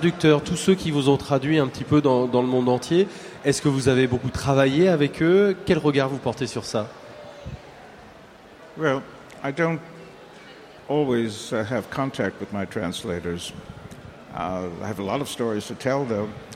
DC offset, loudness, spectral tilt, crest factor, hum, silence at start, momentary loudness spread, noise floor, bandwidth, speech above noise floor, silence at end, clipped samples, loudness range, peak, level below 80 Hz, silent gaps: under 0.1%; -23 LUFS; -6 dB/octave; 18 dB; none; 0 s; 22 LU; -47 dBFS; 15.5 kHz; 24 dB; 0 s; under 0.1%; 9 LU; -4 dBFS; -52 dBFS; none